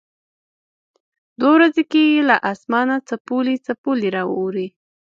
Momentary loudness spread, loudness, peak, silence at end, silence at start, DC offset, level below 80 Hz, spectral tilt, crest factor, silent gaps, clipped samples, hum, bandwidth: 10 LU; -18 LUFS; 0 dBFS; 0.45 s; 1.4 s; under 0.1%; -70 dBFS; -6 dB/octave; 18 dB; 3.20-3.25 s, 3.78-3.84 s; under 0.1%; none; 7.4 kHz